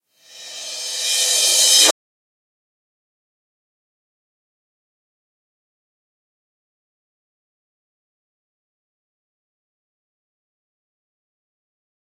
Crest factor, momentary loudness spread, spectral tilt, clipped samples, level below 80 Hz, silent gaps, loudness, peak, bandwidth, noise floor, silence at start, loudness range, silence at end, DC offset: 26 dB; 19 LU; 3.5 dB/octave; under 0.1%; under -90 dBFS; none; -13 LUFS; 0 dBFS; 16.5 kHz; -42 dBFS; 0.35 s; 3 LU; 10.1 s; under 0.1%